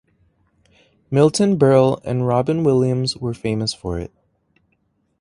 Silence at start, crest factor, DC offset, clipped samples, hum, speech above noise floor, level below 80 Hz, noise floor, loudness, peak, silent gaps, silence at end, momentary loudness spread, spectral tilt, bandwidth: 1.1 s; 18 dB; under 0.1%; under 0.1%; none; 49 dB; -46 dBFS; -66 dBFS; -18 LUFS; -2 dBFS; none; 1.15 s; 13 LU; -6.5 dB/octave; 11.5 kHz